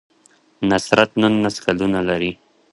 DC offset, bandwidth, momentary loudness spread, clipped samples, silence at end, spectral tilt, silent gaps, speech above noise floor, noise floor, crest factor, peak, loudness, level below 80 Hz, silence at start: under 0.1%; 11.5 kHz; 7 LU; under 0.1%; 0.4 s; -5 dB/octave; none; 38 dB; -56 dBFS; 20 dB; 0 dBFS; -18 LUFS; -50 dBFS; 0.6 s